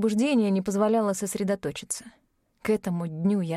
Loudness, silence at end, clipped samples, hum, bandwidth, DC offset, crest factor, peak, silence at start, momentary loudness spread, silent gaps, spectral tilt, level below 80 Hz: -26 LUFS; 0 s; under 0.1%; none; 15 kHz; under 0.1%; 14 dB; -12 dBFS; 0 s; 10 LU; none; -6 dB/octave; -62 dBFS